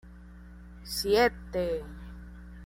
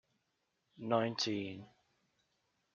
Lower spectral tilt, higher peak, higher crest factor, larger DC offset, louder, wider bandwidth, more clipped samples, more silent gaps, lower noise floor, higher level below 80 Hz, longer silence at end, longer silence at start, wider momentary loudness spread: about the same, -4 dB/octave vs -3.5 dB/octave; first, -10 dBFS vs -18 dBFS; about the same, 20 dB vs 24 dB; neither; first, -29 LUFS vs -37 LUFS; first, 16 kHz vs 7.4 kHz; neither; neither; second, -48 dBFS vs -83 dBFS; first, -46 dBFS vs -84 dBFS; second, 0 s vs 1.1 s; second, 0.05 s vs 0.8 s; first, 26 LU vs 15 LU